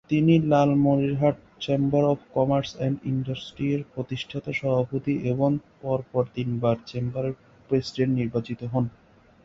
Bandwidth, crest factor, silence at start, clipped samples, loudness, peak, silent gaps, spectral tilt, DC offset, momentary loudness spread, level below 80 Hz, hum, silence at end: 7.6 kHz; 18 dB; 0.1 s; under 0.1%; -25 LUFS; -8 dBFS; none; -8 dB/octave; under 0.1%; 11 LU; -56 dBFS; none; 0.55 s